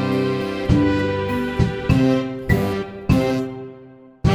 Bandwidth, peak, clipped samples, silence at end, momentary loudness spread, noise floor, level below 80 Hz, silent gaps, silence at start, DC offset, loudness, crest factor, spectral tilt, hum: 15 kHz; -2 dBFS; under 0.1%; 0 s; 8 LU; -43 dBFS; -34 dBFS; none; 0 s; under 0.1%; -20 LUFS; 18 dB; -7.5 dB/octave; none